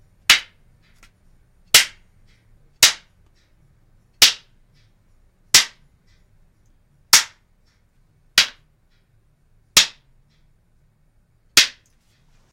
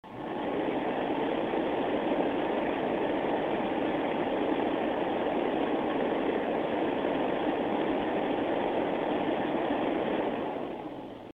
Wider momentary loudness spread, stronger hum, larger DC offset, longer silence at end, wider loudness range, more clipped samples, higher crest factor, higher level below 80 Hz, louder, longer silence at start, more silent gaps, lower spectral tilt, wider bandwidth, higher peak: first, 11 LU vs 2 LU; neither; neither; first, 0.85 s vs 0.05 s; first, 4 LU vs 1 LU; neither; first, 24 dB vs 16 dB; first, -54 dBFS vs -60 dBFS; first, -15 LUFS vs -30 LUFS; first, 0.3 s vs 0.05 s; neither; second, 2 dB/octave vs -7.5 dB/octave; first, 16.5 kHz vs 5.4 kHz; first, 0 dBFS vs -14 dBFS